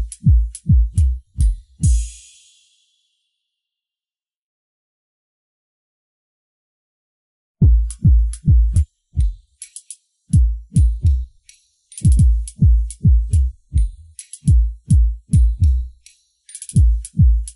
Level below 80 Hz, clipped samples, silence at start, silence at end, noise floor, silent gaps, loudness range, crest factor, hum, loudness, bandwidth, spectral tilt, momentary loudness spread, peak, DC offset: -18 dBFS; under 0.1%; 0 s; 0.05 s; under -90 dBFS; 4.37-7.55 s; 6 LU; 12 dB; none; -18 LUFS; 11.5 kHz; -7.5 dB/octave; 19 LU; -4 dBFS; under 0.1%